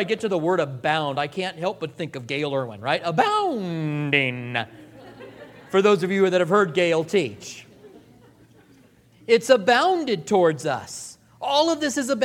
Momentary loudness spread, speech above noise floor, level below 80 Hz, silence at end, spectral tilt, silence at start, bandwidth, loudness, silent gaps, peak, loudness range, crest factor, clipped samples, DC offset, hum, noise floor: 17 LU; 32 dB; -66 dBFS; 0 s; -4.5 dB/octave; 0 s; 15.5 kHz; -22 LUFS; none; -2 dBFS; 3 LU; 20 dB; under 0.1%; under 0.1%; none; -54 dBFS